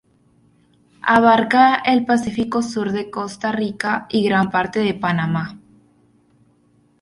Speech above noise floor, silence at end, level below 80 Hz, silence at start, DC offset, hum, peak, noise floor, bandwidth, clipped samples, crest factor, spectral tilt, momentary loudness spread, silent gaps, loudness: 40 dB; 1.45 s; -54 dBFS; 1.05 s; under 0.1%; none; -2 dBFS; -58 dBFS; 11.5 kHz; under 0.1%; 18 dB; -6 dB/octave; 11 LU; none; -18 LUFS